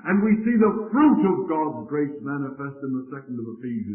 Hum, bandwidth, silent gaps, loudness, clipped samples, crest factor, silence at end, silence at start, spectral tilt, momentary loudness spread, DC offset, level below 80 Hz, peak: none; 3.2 kHz; none; -23 LUFS; under 0.1%; 16 dB; 0 s; 0.05 s; -13 dB/octave; 14 LU; under 0.1%; -62 dBFS; -8 dBFS